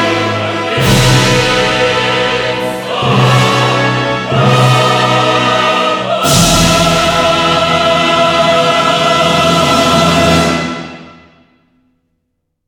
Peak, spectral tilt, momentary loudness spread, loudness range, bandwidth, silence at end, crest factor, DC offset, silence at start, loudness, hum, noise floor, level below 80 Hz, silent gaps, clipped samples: 0 dBFS; -4 dB/octave; 6 LU; 2 LU; 19.5 kHz; 1.55 s; 10 dB; under 0.1%; 0 s; -10 LUFS; none; -67 dBFS; -32 dBFS; none; under 0.1%